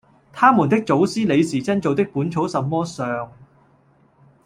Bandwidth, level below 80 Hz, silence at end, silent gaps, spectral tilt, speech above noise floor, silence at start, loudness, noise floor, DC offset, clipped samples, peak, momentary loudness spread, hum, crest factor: 12 kHz; -60 dBFS; 1 s; none; -6.5 dB/octave; 38 dB; 0.35 s; -19 LUFS; -56 dBFS; under 0.1%; under 0.1%; -2 dBFS; 10 LU; none; 18 dB